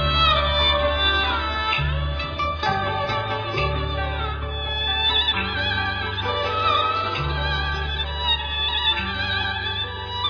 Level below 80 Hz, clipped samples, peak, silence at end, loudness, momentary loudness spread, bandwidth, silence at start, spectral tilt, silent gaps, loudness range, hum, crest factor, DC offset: -32 dBFS; under 0.1%; -6 dBFS; 0 s; -22 LUFS; 8 LU; 5.4 kHz; 0 s; -5.5 dB/octave; none; 2 LU; none; 16 dB; under 0.1%